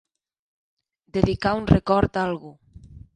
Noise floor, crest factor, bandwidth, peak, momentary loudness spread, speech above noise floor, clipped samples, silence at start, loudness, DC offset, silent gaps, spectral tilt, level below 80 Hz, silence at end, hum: -45 dBFS; 24 dB; 9.6 kHz; 0 dBFS; 10 LU; 24 dB; under 0.1%; 1.15 s; -22 LUFS; under 0.1%; none; -8 dB/octave; -38 dBFS; 0.2 s; none